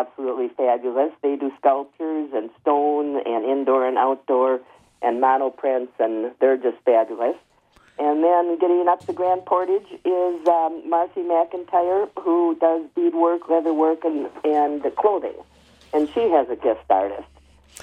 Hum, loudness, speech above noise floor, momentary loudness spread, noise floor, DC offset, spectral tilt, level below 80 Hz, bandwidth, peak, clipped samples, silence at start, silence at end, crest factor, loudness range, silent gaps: none; -21 LUFS; 36 dB; 7 LU; -57 dBFS; under 0.1%; -6 dB/octave; -64 dBFS; 5.2 kHz; -4 dBFS; under 0.1%; 0 s; 0.6 s; 16 dB; 1 LU; none